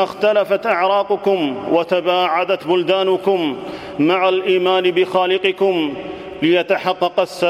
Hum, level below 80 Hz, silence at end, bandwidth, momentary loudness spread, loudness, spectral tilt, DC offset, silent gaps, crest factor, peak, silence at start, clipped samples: none; -58 dBFS; 0 s; 13.5 kHz; 5 LU; -17 LUFS; -5.5 dB/octave; under 0.1%; none; 16 dB; -2 dBFS; 0 s; under 0.1%